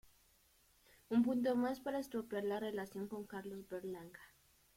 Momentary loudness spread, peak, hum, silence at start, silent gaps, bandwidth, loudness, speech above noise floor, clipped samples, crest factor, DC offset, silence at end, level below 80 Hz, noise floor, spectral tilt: 13 LU; -24 dBFS; none; 1.1 s; none; 16.5 kHz; -40 LUFS; 32 dB; under 0.1%; 18 dB; under 0.1%; 0.5 s; -74 dBFS; -72 dBFS; -6 dB/octave